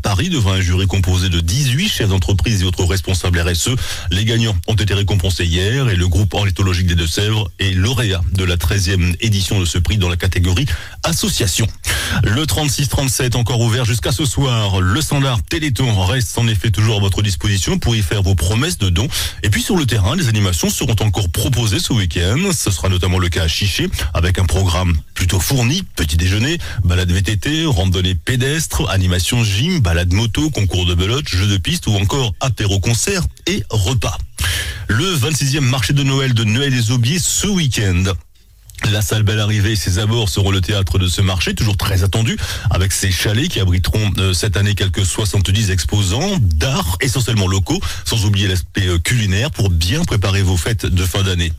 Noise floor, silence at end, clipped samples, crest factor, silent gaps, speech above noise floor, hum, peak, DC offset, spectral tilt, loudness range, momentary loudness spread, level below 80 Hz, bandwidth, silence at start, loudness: -41 dBFS; 0 s; under 0.1%; 10 dB; none; 26 dB; none; -6 dBFS; under 0.1%; -4.5 dB/octave; 1 LU; 3 LU; -26 dBFS; 16.5 kHz; 0 s; -16 LUFS